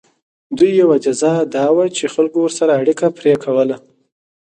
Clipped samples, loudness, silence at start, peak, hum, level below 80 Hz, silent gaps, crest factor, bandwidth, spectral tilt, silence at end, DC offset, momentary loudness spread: under 0.1%; -15 LUFS; 0.5 s; 0 dBFS; none; -62 dBFS; none; 14 dB; 9.6 kHz; -5.5 dB/octave; 0.65 s; under 0.1%; 5 LU